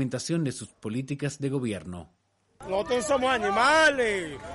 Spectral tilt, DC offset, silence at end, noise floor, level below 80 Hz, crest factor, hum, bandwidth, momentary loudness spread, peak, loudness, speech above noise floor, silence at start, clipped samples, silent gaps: -4.5 dB/octave; under 0.1%; 0 s; -48 dBFS; -56 dBFS; 16 dB; none; 11.5 kHz; 16 LU; -12 dBFS; -26 LUFS; 22 dB; 0 s; under 0.1%; none